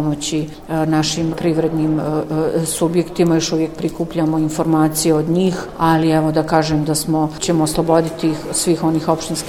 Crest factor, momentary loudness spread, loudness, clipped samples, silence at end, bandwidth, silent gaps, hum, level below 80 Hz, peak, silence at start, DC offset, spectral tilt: 16 dB; 5 LU; -17 LUFS; under 0.1%; 0 s; 16 kHz; none; none; -42 dBFS; 0 dBFS; 0 s; under 0.1%; -5.5 dB/octave